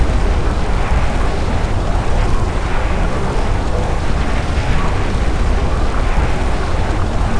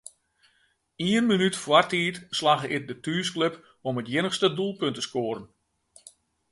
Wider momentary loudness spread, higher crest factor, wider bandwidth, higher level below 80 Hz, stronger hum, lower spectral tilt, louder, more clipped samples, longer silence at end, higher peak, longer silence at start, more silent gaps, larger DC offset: second, 1 LU vs 10 LU; second, 14 dB vs 24 dB; about the same, 10.5 kHz vs 11.5 kHz; first, -16 dBFS vs -68 dBFS; neither; first, -6 dB/octave vs -4.5 dB/octave; first, -19 LUFS vs -26 LUFS; neither; second, 0 s vs 1.05 s; first, 0 dBFS vs -4 dBFS; second, 0 s vs 1 s; neither; neither